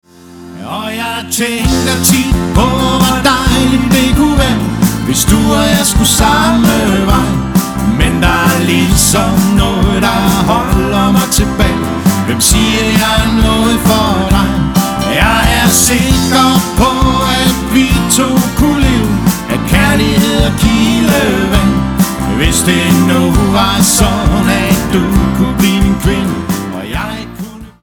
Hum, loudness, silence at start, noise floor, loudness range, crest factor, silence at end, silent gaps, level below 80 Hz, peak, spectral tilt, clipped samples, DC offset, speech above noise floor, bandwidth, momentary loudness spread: none; -10 LUFS; 0.25 s; -33 dBFS; 1 LU; 10 dB; 0.1 s; none; -20 dBFS; 0 dBFS; -4.5 dB/octave; under 0.1%; under 0.1%; 23 dB; over 20 kHz; 5 LU